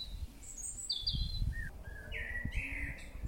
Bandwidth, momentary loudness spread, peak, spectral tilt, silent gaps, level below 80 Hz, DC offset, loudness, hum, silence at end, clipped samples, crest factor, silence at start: 16.5 kHz; 11 LU; -22 dBFS; -2.5 dB/octave; none; -44 dBFS; under 0.1%; -40 LUFS; none; 0 s; under 0.1%; 18 dB; 0 s